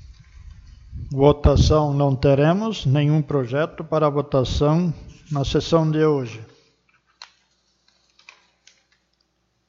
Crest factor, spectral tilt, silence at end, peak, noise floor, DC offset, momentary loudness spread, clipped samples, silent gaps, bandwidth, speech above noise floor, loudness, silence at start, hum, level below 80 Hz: 20 dB; -7 dB/octave; 2.45 s; 0 dBFS; -69 dBFS; under 0.1%; 13 LU; under 0.1%; none; 7.4 kHz; 50 dB; -20 LUFS; 0.1 s; none; -34 dBFS